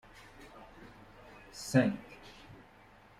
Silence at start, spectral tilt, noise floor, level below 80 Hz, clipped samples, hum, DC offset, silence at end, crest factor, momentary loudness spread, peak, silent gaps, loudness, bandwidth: 0.4 s; -6 dB/octave; -59 dBFS; -64 dBFS; under 0.1%; none; under 0.1%; 0.65 s; 24 dB; 26 LU; -14 dBFS; none; -32 LUFS; 15.5 kHz